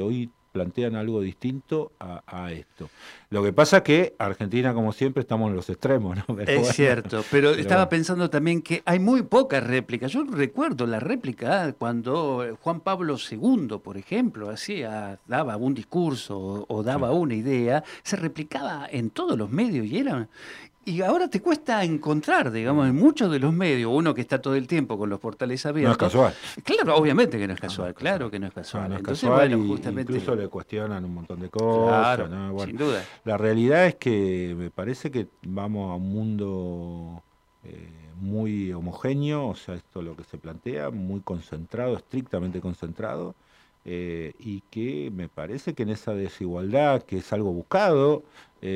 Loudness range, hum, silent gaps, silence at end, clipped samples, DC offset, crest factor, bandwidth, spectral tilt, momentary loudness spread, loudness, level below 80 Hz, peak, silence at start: 9 LU; none; none; 0 s; under 0.1%; under 0.1%; 20 dB; 14 kHz; -6.5 dB/octave; 15 LU; -25 LUFS; -60 dBFS; -4 dBFS; 0 s